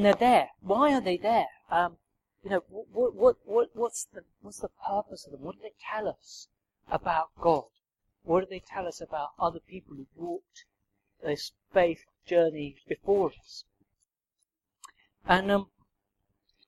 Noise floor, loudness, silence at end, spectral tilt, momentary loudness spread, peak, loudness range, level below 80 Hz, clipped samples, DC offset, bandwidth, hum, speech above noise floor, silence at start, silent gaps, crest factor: -81 dBFS; -29 LUFS; 1.05 s; -5 dB/octave; 21 LU; -6 dBFS; 7 LU; -60 dBFS; under 0.1%; under 0.1%; 13.5 kHz; none; 53 dB; 0 s; none; 24 dB